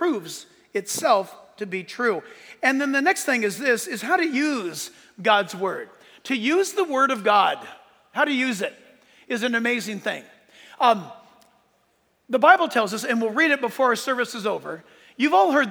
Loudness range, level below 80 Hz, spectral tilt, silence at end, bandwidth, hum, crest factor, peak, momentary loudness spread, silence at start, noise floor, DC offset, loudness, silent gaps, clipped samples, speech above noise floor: 5 LU; -80 dBFS; -3 dB/octave; 0 s; over 20 kHz; none; 22 dB; -2 dBFS; 15 LU; 0 s; -66 dBFS; under 0.1%; -22 LUFS; none; under 0.1%; 44 dB